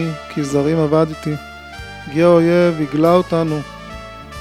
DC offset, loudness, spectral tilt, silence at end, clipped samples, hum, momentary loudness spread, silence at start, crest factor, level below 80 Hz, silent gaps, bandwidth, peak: under 0.1%; -16 LUFS; -7 dB/octave; 0 s; under 0.1%; none; 20 LU; 0 s; 16 dB; -42 dBFS; none; 14 kHz; 0 dBFS